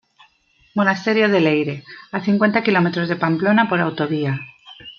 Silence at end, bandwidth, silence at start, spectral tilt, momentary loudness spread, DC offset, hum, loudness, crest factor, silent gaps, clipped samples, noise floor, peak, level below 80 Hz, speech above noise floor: 0.1 s; 6.8 kHz; 0.75 s; -7.5 dB/octave; 13 LU; under 0.1%; none; -18 LUFS; 18 dB; none; under 0.1%; -58 dBFS; -2 dBFS; -64 dBFS; 40 dB